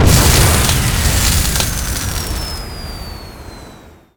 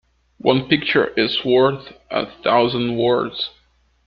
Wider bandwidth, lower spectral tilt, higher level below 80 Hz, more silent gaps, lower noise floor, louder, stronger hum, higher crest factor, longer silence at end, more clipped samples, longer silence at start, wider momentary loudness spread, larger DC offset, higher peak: first, over 20 kHz vs 5.8 kHz; second, -3.5 dB/octave vs -8 dB/octave; first, -20 dBFS vs -54 dBFS; neither; second, -39 dBFS vs -59 dBFS; first, -14 LUFS vs -19 LUFS; neither; about the same, 16 dB vs 18 dB; second, 0.25 s vs 0.55 s; neither; second, 0 s vs 0.45 s; first, 21 LU vs 9 LU; neither; about the same, 0 dBFS vs -2 dBFS